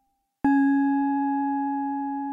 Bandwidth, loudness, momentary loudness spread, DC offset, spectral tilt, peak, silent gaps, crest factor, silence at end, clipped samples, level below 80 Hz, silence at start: 3.9 kHz; -24 LUFS; 7 LU; under 0.1%; -8 dB/octave; -12 dBFS; none; 12 dB; 0 s; under 0.1%; -62 dBFS; 0.45 s